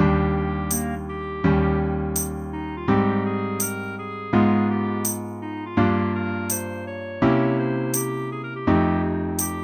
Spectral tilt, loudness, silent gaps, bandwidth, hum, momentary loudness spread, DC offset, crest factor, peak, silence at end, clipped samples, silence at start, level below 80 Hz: -6 dB/octave; -23 LUFS; none; 19 kHz; none; 10 LU; under 0.1%; 16 dB; -6 dBFS; 0 s; under 0.1%; 0 s; -38 dBFS